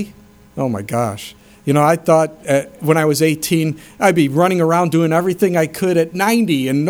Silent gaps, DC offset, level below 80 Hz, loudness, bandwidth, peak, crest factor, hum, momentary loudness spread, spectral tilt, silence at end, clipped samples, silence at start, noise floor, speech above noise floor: none; under 0.1%; -54 dBFS; -16 LUFS; 19.5 kHz; 0 dBFS; 16 dB; none; 9 LU; -6 dB/octave; 0 s; under 0.1%; 0 s; -43 dBFS; 28 dB